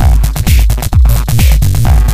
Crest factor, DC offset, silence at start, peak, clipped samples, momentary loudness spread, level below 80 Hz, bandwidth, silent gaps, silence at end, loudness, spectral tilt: 8 dB; under 0.1%; 0 s; 0 dBFS; 0.1%; 2 LU; -8 dBFS; 16 kHz; none; 0 s; -10 LUFS; -5.5 dB/octave